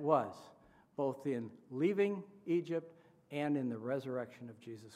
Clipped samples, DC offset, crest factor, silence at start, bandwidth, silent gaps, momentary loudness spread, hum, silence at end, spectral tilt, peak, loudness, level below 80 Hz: under 0.1%; under 0.1%; 22 dB; 0 s; 13.5 kHz; none; 17 LU; none; 0 s; -8 dB/octave; -16 dBFS; -38 LUFS; -84 dBFS